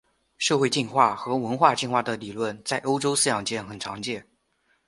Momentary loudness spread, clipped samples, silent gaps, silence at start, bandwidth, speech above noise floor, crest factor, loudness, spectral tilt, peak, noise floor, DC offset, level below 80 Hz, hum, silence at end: 11 LU; under 0.1%; none; 0.4 s; 12 kHz; 45 dB; 22 dB; -24 LUFS; -3.5 dB/octave; -4 dBFS; -69 dBFS; under 0.1%; -64 dBFS; none; 0.65 s